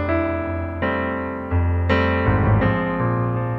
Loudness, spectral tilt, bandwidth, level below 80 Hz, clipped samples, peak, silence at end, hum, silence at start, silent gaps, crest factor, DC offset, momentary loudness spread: -21 LUFS; -9.5 dB/octave; 5.6 kHz; -32 dBFS; under 0.1%; -4 dBFS; 0 s; none; 0 s; none; 16 dB; under 0.1%; 7 LU